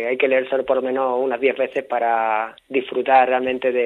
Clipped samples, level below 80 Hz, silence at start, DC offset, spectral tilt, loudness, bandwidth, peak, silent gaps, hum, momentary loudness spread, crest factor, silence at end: under 0.1%; -64 dBFS; 0 s; under 0.1%; -6 dB/octave; -20 LUFS; 4.2 kHz; -2 dBFS; none; none; 8 LU; 18 dB; 0 s